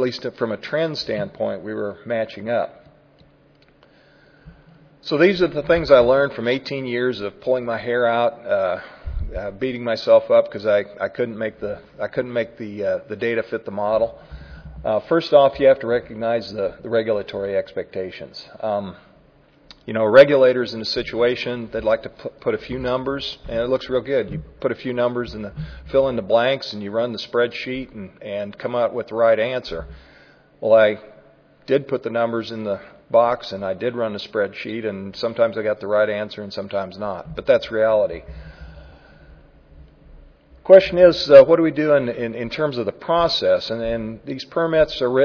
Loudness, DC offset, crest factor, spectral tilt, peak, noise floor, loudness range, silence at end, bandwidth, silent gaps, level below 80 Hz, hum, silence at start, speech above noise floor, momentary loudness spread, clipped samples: -20 LUFS; under 0.1%; 20 dB; -6.5 dB/octave; 0 dBFS; -54 dBFS; 9 LU; 0 s; 5.4 kHz; none; -44 dBFS; none; 0 s; 35 dB; 15 LU; under 0.1%